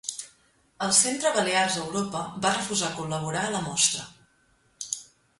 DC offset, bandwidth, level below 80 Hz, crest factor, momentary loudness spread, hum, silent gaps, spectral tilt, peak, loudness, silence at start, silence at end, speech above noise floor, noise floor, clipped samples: under 0.1%; 11.5 kHz; -64 dBFS; 22 dB; 14 LU; none; none; -2 dB/octave; -6 dBFS; -25 LUFS; 0.05 s; 0.35 s; 39 dB; -65 dBFS; under 0.1%